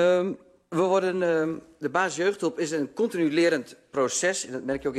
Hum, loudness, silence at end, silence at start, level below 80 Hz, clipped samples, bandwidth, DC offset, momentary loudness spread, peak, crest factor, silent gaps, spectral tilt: none; -26 LUFS; 0 s; 0 s; -64 dBFS; under 0.1%; 13 kHz; under 0.1%; 9 LU; -10 dBFS; 16 dB; none; -4 dB/octave